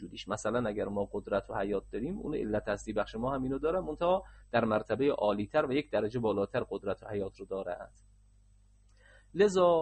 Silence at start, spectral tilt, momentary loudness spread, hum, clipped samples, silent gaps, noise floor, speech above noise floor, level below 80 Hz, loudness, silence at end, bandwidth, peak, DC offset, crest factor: 0 s; -6 dB/octave; 9 LU; 50 Hz at -55 dBFS; under 0.1%; none; -62 dBFS; 31 dB; -54 dBFS; -33 LUFS; 0 s; 8.4 kHz; -14 dBFS; under 0.1%; 18 dB